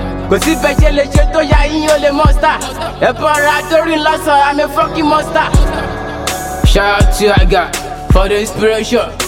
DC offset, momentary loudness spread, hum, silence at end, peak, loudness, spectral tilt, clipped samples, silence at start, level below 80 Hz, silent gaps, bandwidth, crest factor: under 0.1%; 7 LU; none; 0 s; 0 dBFS; -12 LUFS; -5 dB/octave; under 0.1%; 0 s; -16 dBFS; none; 16.5 kHz; 12 dB